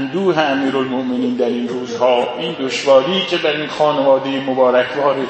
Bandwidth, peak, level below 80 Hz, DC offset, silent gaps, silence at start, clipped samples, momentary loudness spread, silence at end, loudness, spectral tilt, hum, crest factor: 8.6 kHz; 0 dBFS; -62 dBFS; under 0.1%; none; 0 s; under 0.1%; 7 LU; 0 s; -16 LUFS; -5 dB/octave; none; 16 dB